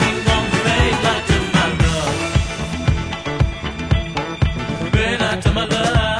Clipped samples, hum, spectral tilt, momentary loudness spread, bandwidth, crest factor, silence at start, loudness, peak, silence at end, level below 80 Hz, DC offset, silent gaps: under 0.1%; none; -5 dB/octave; 6 LU; 10.5 kHz; 16 dB; 0 s; -18 LUFS; -2 dBFS; 0 s; -26 dBFS; under 0.1%; none